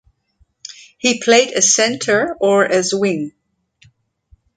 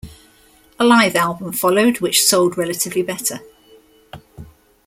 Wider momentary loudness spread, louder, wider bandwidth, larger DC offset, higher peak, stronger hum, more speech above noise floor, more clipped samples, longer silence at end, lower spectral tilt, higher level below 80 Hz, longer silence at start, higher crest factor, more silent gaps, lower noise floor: first, 23 LU vs 9 LU; about the same, -15 LUFS vs -16 LUFS; second, 10 kHz vs 16.5 kHz; neither; about the same, 0 dBFS vs 0 dBFS; neither; first, 45 dB vs 35 dB; neither; first, 1.3 s vs 0.45 s; about the same, -2 dB/octave vs -3 dB/octave; second, -60 dBFS vs -52 dBFS; first, 0.7 s vs 0.05 s; about the same, 18 dB vs 18 dB; neither; first, -60 dBFS vs -51 dBFS